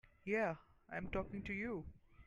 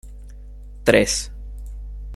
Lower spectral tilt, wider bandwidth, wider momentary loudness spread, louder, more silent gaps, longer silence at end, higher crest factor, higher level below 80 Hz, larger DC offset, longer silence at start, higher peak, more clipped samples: first, -7.5 dB/octave vs -3.5 dB/octave; second, 10 kHz vs 15.5 kHz; second, 11 LU vs 25 LU; second, -43 LUFS vs -19 LUFS; neither; about the same, 0.05 s vs 0 s; second, 16 dB vs 22 dB; second, -60 dBFS vs -34 dBFS; neither; about the same, 0.05 s vs 0.05 s; second, -28 dBFS vs -2 dBFS; neither